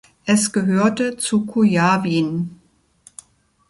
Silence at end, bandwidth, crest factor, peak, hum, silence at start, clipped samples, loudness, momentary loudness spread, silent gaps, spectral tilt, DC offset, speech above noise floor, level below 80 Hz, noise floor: 1.15 s; 11.5 kHz; 16 dB; -4 dBFS; none; 0.25 s; under 0.1%; -18 LUFS; 7 LU; none; -5 dB/octave; under 0.1%; 37 dB; -60 dBFS; -54 dBFS